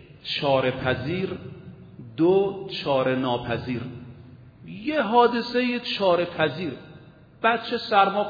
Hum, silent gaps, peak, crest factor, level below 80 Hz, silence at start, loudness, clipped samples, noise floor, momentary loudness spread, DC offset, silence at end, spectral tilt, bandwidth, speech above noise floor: none; none; -6 dBFS; 18 dB; -58 dBFS; 0 s; -24 LUFS; under 0.1%; -48 dBFS; 21 LU; under 0.1%; 0 s; -7 dB/octave; 5 kHz; 25 dB